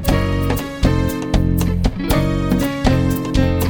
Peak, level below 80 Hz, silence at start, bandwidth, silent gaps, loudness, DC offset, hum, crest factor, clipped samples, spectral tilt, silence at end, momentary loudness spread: 0 dBFS; -22 dBFS; 0 s; over 20 kHz; none; -18 LUFS; under 0.1%; none; 16 dB; under 0.1%; -6.5 dB/octave; 0 s; 3 LU